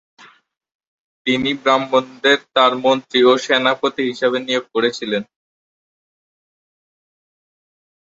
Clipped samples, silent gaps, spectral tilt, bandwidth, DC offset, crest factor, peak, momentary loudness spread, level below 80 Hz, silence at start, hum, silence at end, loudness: under 0.1%; none; -3.5 dB/octave; 8 kHz; under 0.1%; 18 dB; -2 dBFS; 7 LU; -62 dBFS; 1.25 s; none; 2.75 s; -17 LUFS